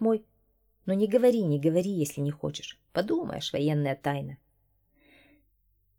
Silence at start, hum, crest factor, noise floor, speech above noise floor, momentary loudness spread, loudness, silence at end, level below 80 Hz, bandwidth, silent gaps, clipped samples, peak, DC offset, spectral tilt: 0 s; none; 18 dB; -70 dBFS; 43 dB; 12 LU; -28 LUFS; 1.65 s; -64 dBFS; 18.5 kHz; none; under 0.1%; -12 dBFS; under 0.1%; -6.5 dB/octave